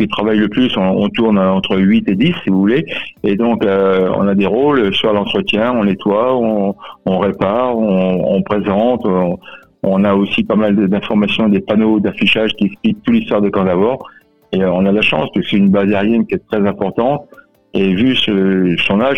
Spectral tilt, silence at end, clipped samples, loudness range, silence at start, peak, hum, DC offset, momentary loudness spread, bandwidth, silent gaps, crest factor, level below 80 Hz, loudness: -8 dB/octave; 0 s; under 0.1%; 1 LU; 0 s; -2 dBFS; none; 0.6%; 5 LU; 6.2 kHz; none; 12 dB; -48 dBFS; -14 LUFS